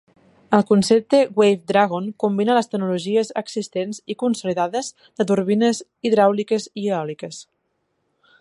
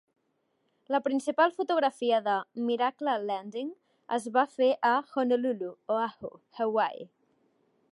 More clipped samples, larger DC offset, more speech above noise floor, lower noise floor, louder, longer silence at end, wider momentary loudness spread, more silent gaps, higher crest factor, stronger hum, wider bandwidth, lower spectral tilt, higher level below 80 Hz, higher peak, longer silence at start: neither; neither; first, 52 dB vs 47 dB; second, -71 dBFS vs -76 dBFS; first, -20 LUFS vs -29 LUFS; first, 1 s vs 0.85 s; about the same, 11 LU vs 10 LU; neither; about the same, 20 dB vs 18 dB; neither; about the same, 11.5 kHz vs 11.5 kHz; about the same, -5.5 dB/octave vs -4.5 dB/octave; first, -66 dBFS vs -82 dBFS; first, 0 dBFS vs -12 dBFS; second, 0.5 s vs 0.9 s